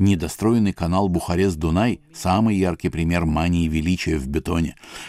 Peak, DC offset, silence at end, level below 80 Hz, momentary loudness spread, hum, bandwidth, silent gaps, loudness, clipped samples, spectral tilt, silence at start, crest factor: -6 dBFS; under 0.1%; 0 s; -34 dBFS; 5 LU; none; 15.5 kHz; none; -21 LUFS; under 0.1%; -6.5 dB/octave; 0 s; 14 dB